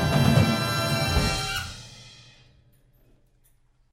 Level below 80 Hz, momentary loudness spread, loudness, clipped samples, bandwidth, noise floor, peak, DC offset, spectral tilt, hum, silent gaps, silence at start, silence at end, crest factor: -38 dBFS; 22 LU; -23 LUFS; under 0.1%; 16.5 kHz; -62 dBFS; -6 dBFS; under 0.1%; -5 dB/octave; none; none; 0 s; 1.8 s; 20 dB